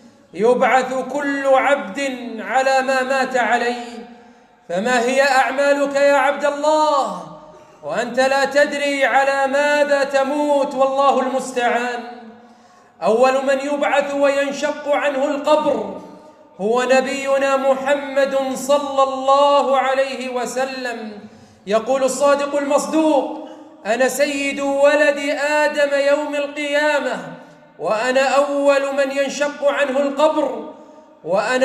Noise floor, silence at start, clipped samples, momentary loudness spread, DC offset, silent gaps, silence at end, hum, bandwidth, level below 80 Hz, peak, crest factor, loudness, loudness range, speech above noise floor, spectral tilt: -48 dBFS; 0.35 s; under 0.1%; 11 LU; under 0.1%; none; 0 s; none; 14 kHz; -68 dBFS; -4 dBFS; 14 dB; -18 LUFS; 2 LU; 31 dB; -3 dB/octave